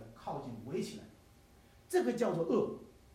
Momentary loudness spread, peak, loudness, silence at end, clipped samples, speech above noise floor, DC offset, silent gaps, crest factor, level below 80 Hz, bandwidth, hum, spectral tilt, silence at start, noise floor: 12 LU; -20 dBFS; -36 LUFS; 0.25 s; under 0.1%; 27 dB; under 0.1%; none; 18 dB; -66 dBFS; 15.5 kHz; none; -6 dB/octave; 0 s; -62 dBFS